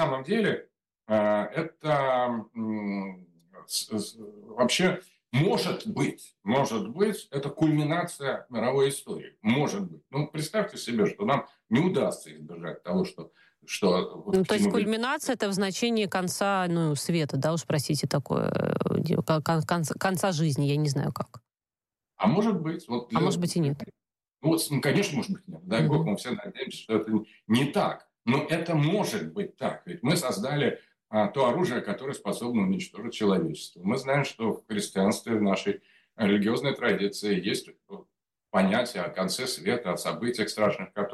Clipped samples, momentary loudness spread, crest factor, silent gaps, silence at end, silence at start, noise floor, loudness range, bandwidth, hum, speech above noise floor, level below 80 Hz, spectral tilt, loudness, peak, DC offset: under 0.1%; 9 LU; 16 dB; none; 0 s; 0 s; under -90 dBFS; 2 LU; 14.5 kHz; none; over 63 dB; -66 dBFS; -5.5 dB/octave; -28 LUFS; -12 dBFS; under 0.1%